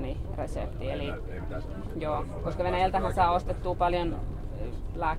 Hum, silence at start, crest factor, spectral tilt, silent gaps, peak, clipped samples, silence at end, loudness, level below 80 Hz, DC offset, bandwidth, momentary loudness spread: none; 0 s; 18 dB; -7 dB/octave; none; -12 dBFS; under 0.1%; 0 s; -31 LUFS; -36 dBFS; under 0.1%; 13 kHz; 12 LU